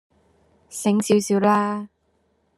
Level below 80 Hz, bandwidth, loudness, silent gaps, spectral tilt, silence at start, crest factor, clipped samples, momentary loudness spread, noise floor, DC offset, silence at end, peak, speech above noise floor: -68 dBFS; 13 kHz; -21 LUFS; none; -5.5 dB/octave; 0.7 s; 18 dB; under 0.1%; 16 LU; -67 dBFS; under 0.1%; 0.7 s; -4 dBFS; 47 dB